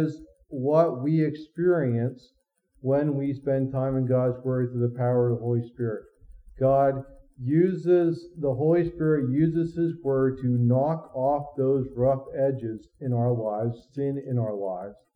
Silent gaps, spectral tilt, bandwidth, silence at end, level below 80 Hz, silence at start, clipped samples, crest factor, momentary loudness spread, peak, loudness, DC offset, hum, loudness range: none; -11 dB/octave; 5 kHz; 0.2 s; -56 dBFS; 0 s; under 0.1%; 16 dB; 9 LU; -10 dBFS; -26 LUFS; under 0.1%; none; 3 LU